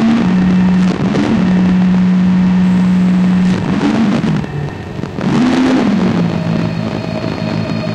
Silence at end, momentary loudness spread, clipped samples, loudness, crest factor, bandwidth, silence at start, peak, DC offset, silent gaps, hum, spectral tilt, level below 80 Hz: 0 s; 8 LU; under 0.1%; -13 LUFS; 10 dB; 8.6 kHz; 0 s; -2 dBFS; under 0.1%; none; none; -7.5 dB/octave; -36 dBFS